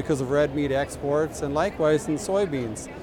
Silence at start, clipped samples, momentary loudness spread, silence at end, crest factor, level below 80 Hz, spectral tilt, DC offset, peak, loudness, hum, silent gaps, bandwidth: 0 s; under 0.1%; 4 LU; 0 s; 14 dB; -46 dBFS; -5.5 dB/octave; under 0.1%; -10 dBFS; -25 LUFS; none; none; 18 kHz